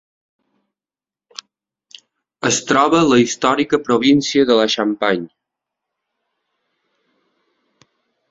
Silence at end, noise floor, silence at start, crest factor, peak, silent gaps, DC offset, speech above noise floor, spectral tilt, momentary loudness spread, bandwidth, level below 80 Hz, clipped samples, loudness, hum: 3.05 s; under -90 dBFS; 2.45 s; 18 dB; -2 dBFS; none; under 0.1%; over 75 dB; -4 dB/octave; 23 LU; 8 kHz; -58 dBFS; under 0.1%; -15 LUFS; none